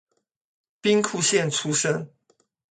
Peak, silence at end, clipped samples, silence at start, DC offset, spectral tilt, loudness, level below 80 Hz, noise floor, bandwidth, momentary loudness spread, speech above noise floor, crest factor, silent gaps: -6 dBFS; 0.65 s; under 0.1%; 0.85 s; under 0.1%; -3 dB/octave; -23 LUFS; -70 dBFS; -67 dBFS; 9.6 kHz; 8 LU; 44 dB; 20 dB; none